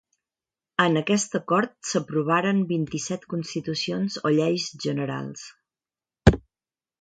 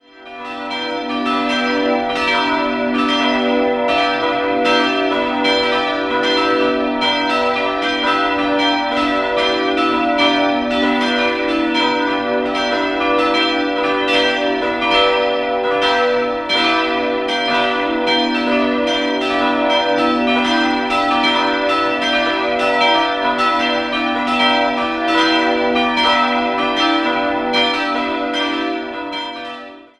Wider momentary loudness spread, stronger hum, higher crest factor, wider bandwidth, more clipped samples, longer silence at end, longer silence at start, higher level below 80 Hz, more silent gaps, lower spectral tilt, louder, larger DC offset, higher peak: first, 10 LU vs 4 LU; neither; first, 26 dB vs 16 dB; second, 9.4 kHz vs 11 kHz; neither; first, 0.6 s vs 0.15 s; first, 0.8 s vs 0.15 s; first, -40 dBFS vs -48 dBFS; neither; first, -5 dB/octave vs -3.5 dB/octave; second, -25 LUFS vs -16 LUFS; neither; about the same, 0 dBFS vs -2 dBFS